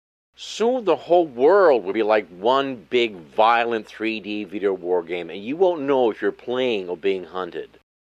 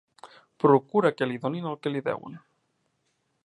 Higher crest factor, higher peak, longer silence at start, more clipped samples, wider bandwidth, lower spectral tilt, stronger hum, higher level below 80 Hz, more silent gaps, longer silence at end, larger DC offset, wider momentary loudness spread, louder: about the same, 18 dB vs 22 dB; about the same, -4 dBFS vs -6 dBFS; first, 0.4 s vs 0.25 s; neither; about the same, 9 kHz vs 9 kHz; second, -5 dB/octave vs -8 dB/octave; neither; first, -66 dBFS vs -78 dBFS; neither; second, 0.5 s vs 1.05 s; neither; about the same, 12 LU vs 12 LU; first, -21 LUFS vs -26 LUFS